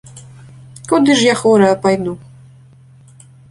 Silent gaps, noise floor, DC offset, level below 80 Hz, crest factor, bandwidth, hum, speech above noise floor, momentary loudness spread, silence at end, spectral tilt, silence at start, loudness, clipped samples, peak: none; -43 dBFS; under 0.1%; -54 dBFS; 16 dB; 11.5 kHz; none; 31 dB; 17 LU; 1.35 s; -4.5 dB/octave; 0.15 s; -13 LUFS; under 0.1%; -2 dBFS